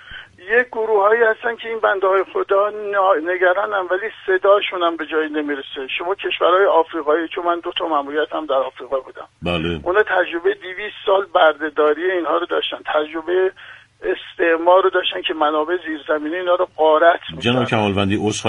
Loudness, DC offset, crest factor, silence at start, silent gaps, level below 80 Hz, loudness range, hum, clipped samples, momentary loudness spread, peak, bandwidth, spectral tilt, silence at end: -18 LUFS; under 0.1%; 18 dB; 0.05 s; none; -52 dBFS; 3 LU; none; under 0.1%; 9 LU; 0 dBFS; 10.5 kHz; -5 dB/octave; 0 s